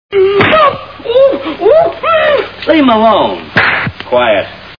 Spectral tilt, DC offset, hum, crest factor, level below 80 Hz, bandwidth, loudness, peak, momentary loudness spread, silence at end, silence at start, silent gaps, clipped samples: -7 dB/octave; 0.3%; none; 10 dB; -42 dBFS; 5.4 kHz; -9 LUFS; 0 dBFS; 6 LU; 0.05 s; 0.1 s; none; 0.5%